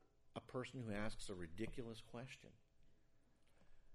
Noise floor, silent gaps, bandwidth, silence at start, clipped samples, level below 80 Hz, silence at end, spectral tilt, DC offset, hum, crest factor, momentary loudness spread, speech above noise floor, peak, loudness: -72 dBFS; none; 12 kHz; 0 s; under 0.1%; -62 dBFS; 0 s; -5.5 dB/octave; under 0.1%; none; 18 dB; 10 LU; 23 dB; -32 dBFS; -51 LUFS